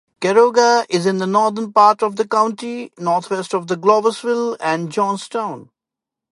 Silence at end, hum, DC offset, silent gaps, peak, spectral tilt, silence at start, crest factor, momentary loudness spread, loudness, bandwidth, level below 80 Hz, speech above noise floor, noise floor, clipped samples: 0.7 s; none; under 0.1%; none; 0 dBFS; -4.5 dB/octave; 0.2 s; 16 dB; 12 LU; -17 LUFS; 11.5 kHz; -70 dBFS; 69 dB; -86 dBFS; under 0.1%